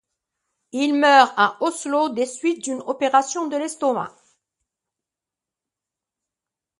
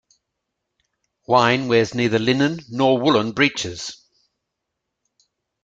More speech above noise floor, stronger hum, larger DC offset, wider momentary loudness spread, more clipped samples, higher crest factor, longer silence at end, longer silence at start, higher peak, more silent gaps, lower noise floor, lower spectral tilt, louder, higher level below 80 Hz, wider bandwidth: first, 68 dB vs 61 dB; neither; neither; about the same, 13 LU vs 11 LU; neither; about the same, 22 dB vs 20 dB; first, 2.7 s vs 1.7 s; second, 0.75 s vs 1.3 s; about the same, 0 dBFS vs -2 dBFS; neither; first, -88 dBFS vs -80 dBFS; second, -2.5 dB/octave vs -5 dB/octave; about the same, -20 LUFS vs -19 LUFS; second, -78 dBFS vs -58 dBFS; first, 11.5 kHz vs 9 kHz